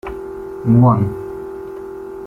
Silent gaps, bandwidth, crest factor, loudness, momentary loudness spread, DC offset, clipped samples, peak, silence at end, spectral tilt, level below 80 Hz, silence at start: none; 3.1 kHz; 16 dB; -15 LUFS; 18 LU; under 0.1%; under 0.1%; -2 dBFS; 0 s; -11 dB/octave; -42 dBFS; 0.05 s